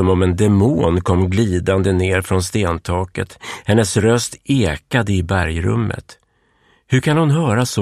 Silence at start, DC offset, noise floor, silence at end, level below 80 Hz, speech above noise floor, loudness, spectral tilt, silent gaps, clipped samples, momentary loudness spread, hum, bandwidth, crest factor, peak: 0 s; 0.3%; -58 dBFS; 0 s; -36 dBFS; 42 dB; -17 LUFS; -6 dB/octave; none; under 0.1%; 7 LU; none; 14 kHz; 14 dB; -2 dBFS